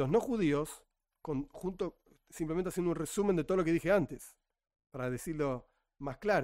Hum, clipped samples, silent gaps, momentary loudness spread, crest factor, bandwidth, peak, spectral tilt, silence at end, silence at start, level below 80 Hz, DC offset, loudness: none; under 0.1%; none; 17 LU; 18 dB; 16 kHz; -16 dBFS; -6.5 dB/octave; 0 s; 0 s; -56 dBFS; under 0.1%; -34 LUFS